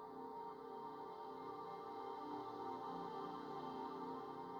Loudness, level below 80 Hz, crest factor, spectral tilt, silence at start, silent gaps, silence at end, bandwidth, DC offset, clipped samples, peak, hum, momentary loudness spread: -50 LUFS; -84 dBFS; 14 dB; -6.5 dB/octave; 0 s; none; 0 s; over 20 kHz; under 0.1%; under 0.1%; -36 dBFS; none; 4 LU